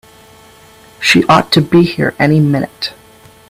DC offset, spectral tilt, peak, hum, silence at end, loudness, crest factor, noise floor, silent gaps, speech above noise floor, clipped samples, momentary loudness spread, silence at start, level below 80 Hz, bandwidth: under 0.1%; -5.5 dB/octave; 0 dBFS; none; 0.55 s; -11 LUFS; 14 dB; -42 dBFS; none; 31 dB; under 0.1%; 11 LU; 1 s; -46 dBFS; 15.5 kHz